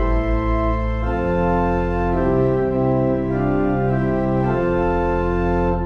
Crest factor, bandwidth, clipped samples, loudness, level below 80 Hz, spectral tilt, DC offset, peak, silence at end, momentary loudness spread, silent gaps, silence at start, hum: 12 dB; 6.6 kHz; under 0.1%; -20 LUFS; -26 dBFS; -10 dB/octave; under 0.1%; -8 dBFS; 0 s; 2 LU; none; 0 s; none